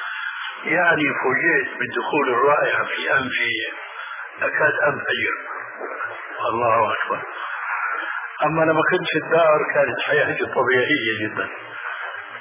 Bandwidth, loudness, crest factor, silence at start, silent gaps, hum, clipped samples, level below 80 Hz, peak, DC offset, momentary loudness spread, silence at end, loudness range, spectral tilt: 3.8 kHz; -20 LUFS; 16 dB; 0 s; none; none; under 0.1%; -64 dBFS; -6 dBFS; under 0.1%; 12 LU; 0 s; 4 LU; -8 dB/octave